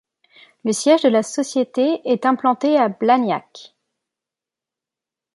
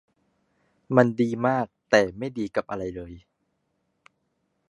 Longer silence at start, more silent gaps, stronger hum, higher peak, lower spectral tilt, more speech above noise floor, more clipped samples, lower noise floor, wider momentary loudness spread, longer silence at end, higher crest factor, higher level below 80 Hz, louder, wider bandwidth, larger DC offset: second, 0.65 s vs 0.9 s; neither; neither; about the same, -2 dBFS vs -2 dBFS; second, -4.5 dB/octave vs -6.5 dB/octave; first, 70 dB vs 51 dB; neither; first, -88 dBFS vs -74 dBFS; second, 8 LU vs 13 LU; first, 1.7 s vs 1.5 s; second, 18 dB vs 26 dB; second, -74 dBFS vs -58 dBFS; first, -18 LUFS vs -24 LUFS; about the same, 11.5 kHz vs 11 kHz; neither